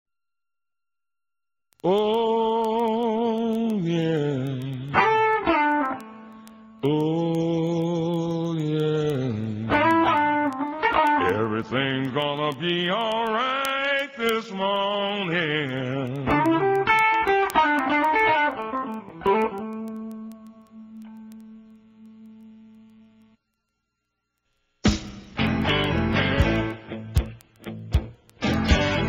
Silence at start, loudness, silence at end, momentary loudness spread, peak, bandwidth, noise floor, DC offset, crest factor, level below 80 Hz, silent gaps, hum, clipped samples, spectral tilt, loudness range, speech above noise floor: 1.85 s; -23 LUFS; 0 s; 13 LU; -4 dBFS; 16 kHz; under -90 dBFS; under 0.1%; 20 dB; -40 dBFS; none; 60 Hz at -60 dBFS; under 0.1%; -6 dB/octave; 9 LU; over 66 dB